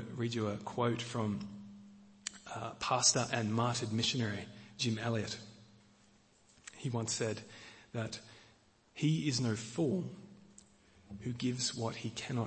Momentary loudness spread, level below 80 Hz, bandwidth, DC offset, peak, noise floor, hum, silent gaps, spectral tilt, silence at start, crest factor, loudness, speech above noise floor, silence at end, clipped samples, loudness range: 20 LU; -70 dBFS; 8.8 kHz; under 0.1%; -14 dBFS; -66 dBFS; none; none; -4 dB/octave; 0 s; 24 dB; -36 LUFS; 31 dB; 0 s; under 0.1%; 7 LU